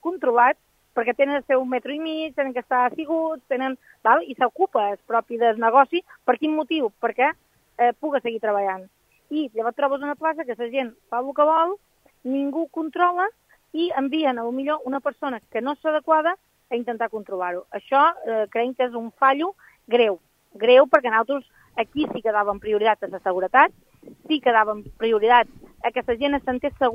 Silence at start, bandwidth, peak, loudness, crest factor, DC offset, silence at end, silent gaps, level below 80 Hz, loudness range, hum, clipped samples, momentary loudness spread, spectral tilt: 0.05 s; 6.6 kHz; 0 dBFS; -22 LUFS; 22 dB; under 0.1%; 0 s; none; -60 dBFS; 4 LU; none; under 0.1%; 11 LU; -5.5 dB/octave